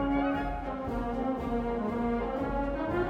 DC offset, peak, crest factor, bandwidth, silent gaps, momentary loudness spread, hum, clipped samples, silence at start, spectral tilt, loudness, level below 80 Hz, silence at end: under 0.1%; -16 dBFS; 14 dB; 8.4 kHz; none; 4 LU; none; under 0.1%; 0 s; -8.5 dB/octave; -32 LUFS; -40 dBFS; 0 s